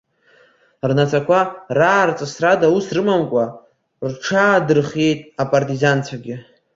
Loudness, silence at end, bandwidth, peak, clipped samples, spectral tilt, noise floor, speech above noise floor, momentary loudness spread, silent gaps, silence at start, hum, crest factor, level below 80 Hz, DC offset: -17 LUFS; 0.35 s; 7.8 kHz; -2 dBFS; under 0.1%; -6 dB/octave; -54 dBFS; 37 dB; 12 LU; none; 0.85 s; none; 16 dB; -58 dBFS; under 0.1%